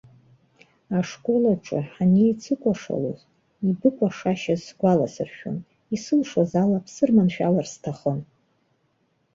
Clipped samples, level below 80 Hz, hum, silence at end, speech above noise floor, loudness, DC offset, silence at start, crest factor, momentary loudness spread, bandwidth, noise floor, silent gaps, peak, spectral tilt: under 0.1%; -62 dBFS; none; 1.1 s; 46 dB; -23 LUFS; under 0.1%; 0.9 s; 18 dB; 12 LU; 7.6 kHz; -68 dBFS; none; -6 dBFS; -7.5 dB/octave